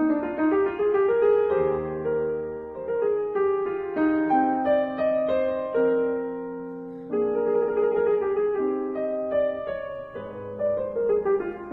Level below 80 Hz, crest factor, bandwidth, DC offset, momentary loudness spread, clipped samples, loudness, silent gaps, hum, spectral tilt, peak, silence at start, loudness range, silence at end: -56 dBFS; 14 dB; 4.1 kHz; under 0.1%; 12 LU; under 0.1%; -25 LUFS; none; none; -9.5 dB/octave; -12 dBFS; 0 s; 2 LU; 0 s